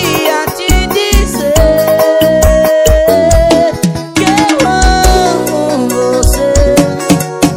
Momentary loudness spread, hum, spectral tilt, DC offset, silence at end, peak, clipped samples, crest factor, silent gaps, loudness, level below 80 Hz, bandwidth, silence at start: 4 LU; none; -4.5 dB/octave; under 0.1%; 0 s; 0 dBFS; 2%; 8 dB; none; -9 LUFS; -16 dBFS; 17.5 kHz; 0 s